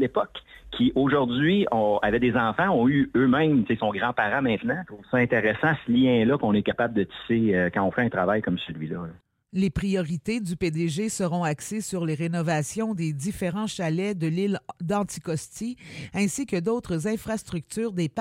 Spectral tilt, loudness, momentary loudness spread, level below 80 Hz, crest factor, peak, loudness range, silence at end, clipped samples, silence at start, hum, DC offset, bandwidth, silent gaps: -6 dB/octave; -25 LUFS; 10 LU; -52 dBFS; 16 dB; -8 dBFS; 6 LU; 0 s; under 0.1%; 0 s; none; under 0.1%; 16 kHz; none